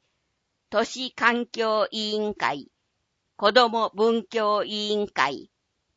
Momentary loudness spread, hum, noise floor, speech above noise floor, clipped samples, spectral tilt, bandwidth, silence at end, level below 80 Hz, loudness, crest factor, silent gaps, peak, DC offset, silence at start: 8 LU; none; -76 dBFS; 52 dB; under 0.1%; -3.5 dB/octave; 8 kHz; 0.5 s; -68 dBFS; -24 LUFS; 22 dB; none; -4 dBFS; under 0.1%; 0.7 s